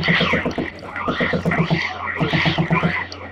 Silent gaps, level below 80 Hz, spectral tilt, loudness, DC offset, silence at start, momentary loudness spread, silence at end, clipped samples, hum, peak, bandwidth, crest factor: none; -44 dBFS; -6.5 dB/octave; -20 LUFS; under 0.1%; 0 s; 8 LU; 0 s; under 0.1%; none; -6 dBFS; 7.6 kHz; 16 dB